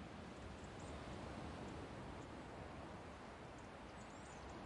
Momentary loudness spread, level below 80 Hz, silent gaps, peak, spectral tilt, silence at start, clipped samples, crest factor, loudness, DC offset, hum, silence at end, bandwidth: 4 LU; -62 dBFS; none; -40 dBFS; -5.5 dB/octave; 0 s; under 0.1%; 14 dB; -53 LUFS; under 0.1%; none; 0 s; 11 kHz